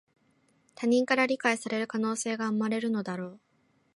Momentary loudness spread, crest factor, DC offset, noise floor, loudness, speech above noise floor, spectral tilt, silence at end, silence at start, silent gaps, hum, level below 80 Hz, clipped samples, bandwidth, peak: 9 LU; 20 dB; under 0.1%; -68 dBFS; -29 LUFS; 40 dB; -4.5 dB/octave; 0.6 s; 0.8 s; none; none; -80 dBFS; under 0.1%; 11.5 kHz; -10 dBFS